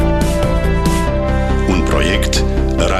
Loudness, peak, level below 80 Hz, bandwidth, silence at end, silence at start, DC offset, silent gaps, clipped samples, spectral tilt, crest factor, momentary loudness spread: -15 LUFS; 0 dBFS; -18 dBFS; 14 kHz; 0 s; 0 s; under 0.1%; none; under 0.1%; -5.5 dB/octave; 12 dB; 2 LU